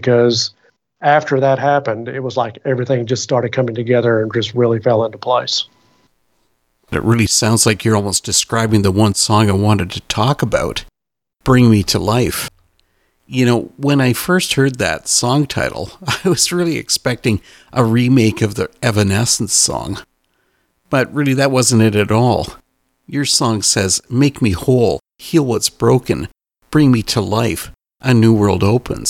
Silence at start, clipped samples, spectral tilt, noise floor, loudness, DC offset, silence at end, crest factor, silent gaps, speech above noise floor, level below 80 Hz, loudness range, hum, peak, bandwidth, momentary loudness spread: 0 s; under 0.1%; -4.5 dB/octave; -83 dBFS; -15 LUFS; under 0.1%; 0 s; 16 dB; none; 69 dB; -42 dBFS; 2 LU; none; 0 dBFS; 16.5 kHz; 9 LU